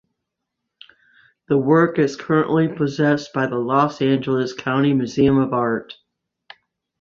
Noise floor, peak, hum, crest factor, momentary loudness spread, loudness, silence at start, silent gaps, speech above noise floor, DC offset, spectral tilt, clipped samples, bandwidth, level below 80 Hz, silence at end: -80 dBFS; -2 dBFS; none; 18 dB; 6 LU; -19 LUFS; 1.5 s; none; 61 dB; under 0.1%; -7 dB/octave; under 0.1%; 7.4 kHz; -54 dBFS; 1.1 s